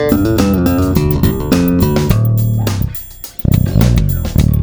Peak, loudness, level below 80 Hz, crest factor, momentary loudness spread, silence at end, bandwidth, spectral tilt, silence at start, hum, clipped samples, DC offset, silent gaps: 0 dBFS; -13 LUFS; -20 dBFS; 12 dB; 7 LU; 0 s; over 20 kHz; -7 dB/octave; 0 s; none; 0.1%; under 0.1%; none